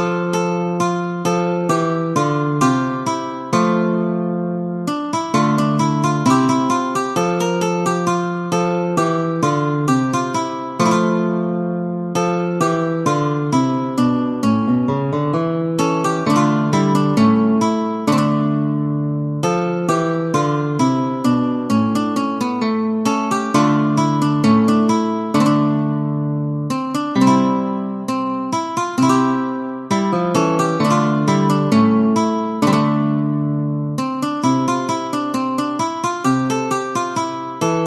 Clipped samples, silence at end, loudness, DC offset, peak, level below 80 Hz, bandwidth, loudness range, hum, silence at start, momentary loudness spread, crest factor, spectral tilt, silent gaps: under 0.1%; 0 s; -18 LUFS; under 0.1%; -2 dBFS; -58 dBFS; 13.5 kHz; 3 LU; none; 0 s; 6 LU; 16 dB; -6.5 dB/octave; none